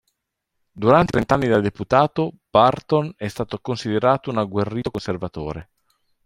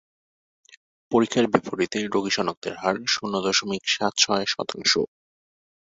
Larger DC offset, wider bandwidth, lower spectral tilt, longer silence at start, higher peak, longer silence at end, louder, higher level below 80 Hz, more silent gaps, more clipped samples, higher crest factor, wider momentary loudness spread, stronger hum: neither; first, 13.5 kHz vs 8 kHz; first, -7 dB/octave vs -2.5 dB/octave; second, 0.75 s vs 1.1 s; about the same, -2 dBFS vs -2 dBFS; second, 0.65 s vs 0.8 s; first, -20 LUFS vs -23 LUFS; first, -48 dBFS vs -64 dBFS; second, none vs 2.57-2.62 s; neither; about the same, 20 dB vs 24 dB; first, 12 LU vs 6 LU; neither